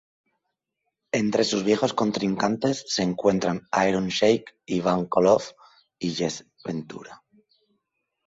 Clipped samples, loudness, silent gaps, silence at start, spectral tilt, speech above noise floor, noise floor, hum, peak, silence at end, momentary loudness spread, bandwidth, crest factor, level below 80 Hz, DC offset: under 0.1%; -24 LUFS; none; 1.15 s; -5 dB/octave; 57 dB; -81 dBFS; none; -6 dBFS; 1.1 s; 12 LU; 8 kHz; 20 dB; -60 dBFS; under 0.1%